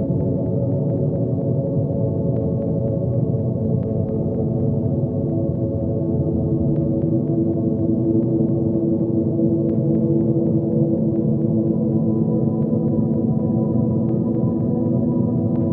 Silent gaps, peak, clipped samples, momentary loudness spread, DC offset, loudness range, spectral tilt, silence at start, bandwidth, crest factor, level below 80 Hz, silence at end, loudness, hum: none; -6 dBFS; under 0.1%; 3 LU; under 0.1%; 2 LU; -15 dB/octave; 0 s; 1.8 kHz; 14 dB; -42 dBFS; 0 s; -20 LUFS; none